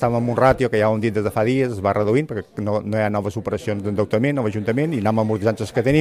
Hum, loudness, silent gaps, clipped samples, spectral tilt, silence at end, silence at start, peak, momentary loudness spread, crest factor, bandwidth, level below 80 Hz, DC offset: none; -20 LUFS; none; under 0.1%; -7.5 dB/octave; 0 s; 0 s; -2 dBFS; 7 LU; 18 dB; 15.5 kHz; -46 dBFS; under 0.1%